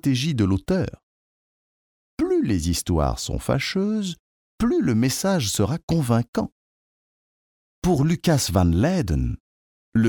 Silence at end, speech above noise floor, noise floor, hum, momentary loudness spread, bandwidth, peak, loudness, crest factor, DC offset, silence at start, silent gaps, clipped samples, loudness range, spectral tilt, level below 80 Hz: 0 s; over 69 dB; under -90 dBFS; none; 8 LU; 19.5 kHz; -6 dBFS; -23 LUFS; 18 dB; under 0.1%; 0.05 s; 1.03-2.17 s, 4.19-4.58 s, 5.83-5.88 s, 6.28-6.33 s, 6.52-7.82 s, 9.40-9.92 s; under 0.1%; 2 LU; -5.5 dB/octave; -38 dBFS